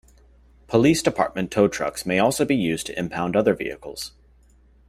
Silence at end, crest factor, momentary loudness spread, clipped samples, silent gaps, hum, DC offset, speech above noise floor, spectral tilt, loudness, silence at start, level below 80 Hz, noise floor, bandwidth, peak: 0.8 s; 18 dB; 13 LU; under 0.1%; none; none; under 0.1%; 33 dB; -5 dB/octave; -22 LUFS; 0.7 s; -52 dBFS; -55 dBFS; 16 kHz; -4 dBFS